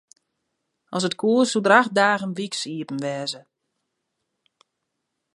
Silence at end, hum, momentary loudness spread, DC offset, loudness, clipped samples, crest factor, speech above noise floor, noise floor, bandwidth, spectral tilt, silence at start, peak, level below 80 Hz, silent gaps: 1.95 s; none; 13 LU; under 0.1%; -22 LUFS; under 0.1%; 24 dB; 58 dB; -79 dBFS; 11.5 kHz; -4 dB/octave; 0.9 s; 0 dBFS; -74 dBFS; none